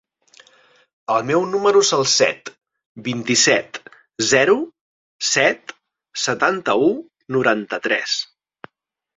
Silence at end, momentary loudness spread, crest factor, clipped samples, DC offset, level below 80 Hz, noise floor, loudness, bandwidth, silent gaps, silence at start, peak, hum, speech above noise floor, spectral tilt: 0.9 s; 17 LU; 20 dB; under 0.1%; under 0.1%; -64 dBFS; -74 dBFS; -18 LUFS; 7.8 kHz; 2.86-2.95 s, 4.81-5.19 s; 1.1 s; -2 dBFS; none; 56 dB; -2.5 dB/octave